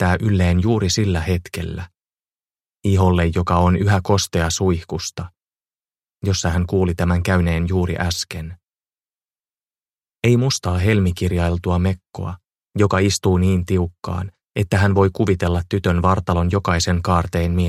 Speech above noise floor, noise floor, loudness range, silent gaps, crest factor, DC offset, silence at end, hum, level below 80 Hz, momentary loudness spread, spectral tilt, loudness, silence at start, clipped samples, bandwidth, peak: over 72 dB; under -90 dBFS; 3 LU; none; 16 dB; under 0.1%; 0 s; none; -34 dBFS; 11 LU; -6 dB/octave; -19 LUFS; 0 s; under 0.1%; 14 kHz; -2 dBFS